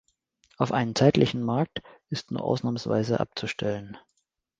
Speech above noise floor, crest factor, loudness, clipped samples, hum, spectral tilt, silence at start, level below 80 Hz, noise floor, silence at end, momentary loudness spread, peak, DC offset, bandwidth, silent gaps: 50 dB; 22 dB; -27 LUFS; under 0.1%; none; -6.5 dB/octave; 0.6 s; -58 dBFS; -77 dBFS; 0.6 s; 14 LU; -6 dBFS; under 0.1%; 9.4 kHz; none